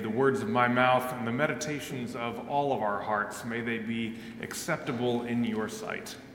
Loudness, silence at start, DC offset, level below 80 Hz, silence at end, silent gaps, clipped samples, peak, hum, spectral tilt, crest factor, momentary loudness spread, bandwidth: -30 LUFS; 0 s; under 0.1%; -66 dBFS; 0 s; none; under 0.1%; -8 dBFS; none; -5 dB/octave; 22 dB; 11 LU; 17 kHz